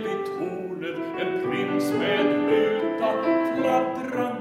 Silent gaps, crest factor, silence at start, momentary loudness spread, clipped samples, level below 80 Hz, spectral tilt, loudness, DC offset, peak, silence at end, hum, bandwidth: none; 14 dB; 0 s; 9 LU; under 0.1%; -68 dBFS; -6 dB/octave; -25 LUFS; under 0.1%; -10 dBFS; 0 s; none; 16 kHz